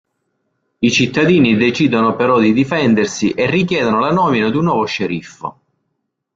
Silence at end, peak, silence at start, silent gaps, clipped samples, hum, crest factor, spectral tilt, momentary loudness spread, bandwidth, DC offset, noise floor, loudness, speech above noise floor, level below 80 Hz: 0.85 s; -2 dBFS; 0.8 s; none; under 0.1%; none; 14 dB; -5.5 dB/octave; 8 LU; 7.8 kHz; under 0.1%; -72 dBFS; -14 LUFS; 58 dB; -50 dBFS